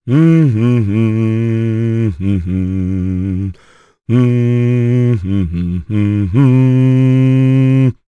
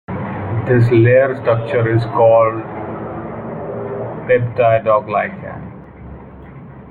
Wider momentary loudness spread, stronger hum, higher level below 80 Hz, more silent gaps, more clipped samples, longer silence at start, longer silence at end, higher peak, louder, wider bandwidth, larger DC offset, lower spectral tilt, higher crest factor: second, 8 LU vs 24 LU; neither; first, -38 dBFS vs -46 dBFS; neither; neither; about the same, 0.05 s vs 0.1 s; first, 0.15 s vs 0 s; about the same, 0 dBFS vs -2 dBFS; first, -13 LUFS vs -16 LUFS; first, 6.4 kHz vs 4.6 kHz; neither; about the same, -10 dB/octave vs -10 dB/octave; about the same, 12 dB vs 14 dB